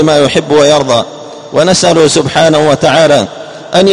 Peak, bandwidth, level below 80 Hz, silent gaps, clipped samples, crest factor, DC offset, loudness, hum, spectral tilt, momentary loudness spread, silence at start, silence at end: 0 dBFS; 11 kHz; -42 dBFS; none; 1%; 8 dB; 0.6%; -8 LUFS; none; -4 dB/octave; 11 LU; 0 s; 0 s